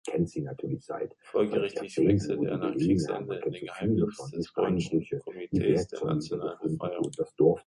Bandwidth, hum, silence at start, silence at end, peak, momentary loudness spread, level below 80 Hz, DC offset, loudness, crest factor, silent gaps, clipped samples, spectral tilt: 11.5 kHz; none; 0.05 s; 0.05 s; -10 dBFS; 10 LU; -54 dBFS; under 0.1%; -30 LUFS; 18 dB; none; under 0.1%; -7.5 dB/octave